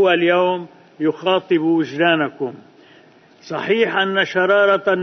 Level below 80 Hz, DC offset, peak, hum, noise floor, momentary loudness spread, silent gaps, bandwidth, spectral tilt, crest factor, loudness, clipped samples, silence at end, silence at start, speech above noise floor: -66 dBFS; under 0.1%; -2 dBFS; none; -49 dBFS; 12 LU; none; 6.4 kHz; -6 dB/octave; 16 dB; -18 LUFS; under 0.1%; 0 s; 0 s; 31 dB